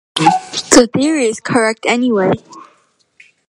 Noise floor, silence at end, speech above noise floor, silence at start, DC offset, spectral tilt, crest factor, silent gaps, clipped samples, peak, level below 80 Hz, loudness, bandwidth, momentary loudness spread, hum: -56 dBFS; 0.85 s; 42 dB; 0.15 s; under 0.1%; -3.5 dB/octave; 14 dB; none; 0.1%; 0 dBFS; -46 dBFS; -13 LUFS; 16 kHz; 7 LU; none